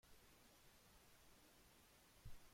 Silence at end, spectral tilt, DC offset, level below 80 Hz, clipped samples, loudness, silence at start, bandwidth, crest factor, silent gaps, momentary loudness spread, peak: 0 s; -3.5 dB/octave; under 0.1%; -72 dBFS; under 0.1%; -69 LUFS; 0.05 s; 16.5 kHz; 20 dB; none; 4 LU; -46 dBFS